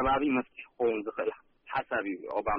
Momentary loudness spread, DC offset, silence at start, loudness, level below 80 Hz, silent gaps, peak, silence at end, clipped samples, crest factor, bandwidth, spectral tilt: 8 LU; under 0.1%; 0 s; -32 LUFS; -54 dBFS; none; -18 dBFS; 0 s; under 0.1%; 12 dB; 5 kHz; -3.5 dB/octave